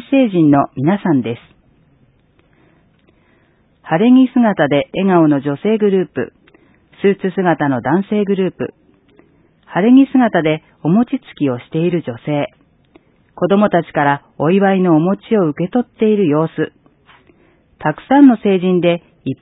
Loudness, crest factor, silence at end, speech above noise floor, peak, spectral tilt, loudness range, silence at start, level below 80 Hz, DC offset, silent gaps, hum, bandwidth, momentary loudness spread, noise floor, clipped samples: -14 LUFS; 16 dB; 0.05 s; 41 dB; 0 dBFS; -12 dB/octave; 4 LU; 0.1 s; -56 dBFS; under 0.1%; none; none; 4 kHz; 11 LU; -55 dBFS; under 0.1%